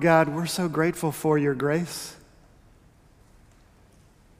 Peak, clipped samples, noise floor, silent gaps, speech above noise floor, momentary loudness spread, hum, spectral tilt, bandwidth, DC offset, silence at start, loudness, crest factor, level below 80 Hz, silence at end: -6 dBFS; under 0.1%; -56 dBFS; none; 32 dB; 12 LU; none; -5.5 dB/octave; 16 kHz; under 0.1%; 0 s; -25 LUFS; 22 dB; -58 dBFS; 2.25 s